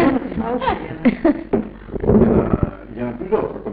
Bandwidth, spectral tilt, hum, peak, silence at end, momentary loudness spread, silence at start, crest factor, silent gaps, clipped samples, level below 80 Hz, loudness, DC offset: 4.8 kHz; -12.5 dB/octave; none; -2 dBFS; 0 s; 12 LU; 0 s; 16 dB; none; under 0.1%; -32 dBFS; -19 LUFS; under 0.1%